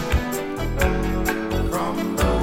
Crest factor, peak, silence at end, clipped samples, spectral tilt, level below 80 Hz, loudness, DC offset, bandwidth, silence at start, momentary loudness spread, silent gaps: 16 dB; -6 dBFS; 0 s; under 0.1%; -5.5 dB/octave; -26 dBFS; -24 LUFS; under 0.1%; 17 kHz; 0 s; 5 LU; none